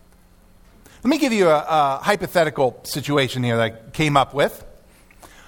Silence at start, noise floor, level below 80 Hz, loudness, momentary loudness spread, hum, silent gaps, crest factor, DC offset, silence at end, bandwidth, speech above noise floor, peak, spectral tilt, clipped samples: 1.05 s; -51 dBFS; -50 dBFS; -20 LUFS; 6 LU; none; none; 20 dB; under 0.1%; 0.2 s; 18 kHz; 32 dB; -2 dBFS; -5 dB/octave; under 0.1%